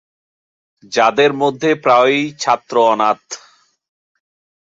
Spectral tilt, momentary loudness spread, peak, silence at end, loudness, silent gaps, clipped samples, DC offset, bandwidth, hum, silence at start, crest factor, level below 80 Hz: -4 dB/octave; 10 LU; -2 dBFS; 1.4 s; -15 LUFS; none; under 0.1%; under 0.1%; 7.8 kHz; none; 0.9 s; 16 dB; -66 dBFS